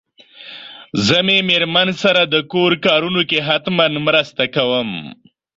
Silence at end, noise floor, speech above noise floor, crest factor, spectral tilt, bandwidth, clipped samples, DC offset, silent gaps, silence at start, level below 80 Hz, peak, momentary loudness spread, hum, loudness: 0.45 s; -40 dBFS; 24 dB; 16 dB; -4.5 dB/octave; 7.8 kHz; under 0.1%; under 0.1%; none; 0.4 s; -56 dBFS; -2 dBFS; 14 LU; none; -15 LUFS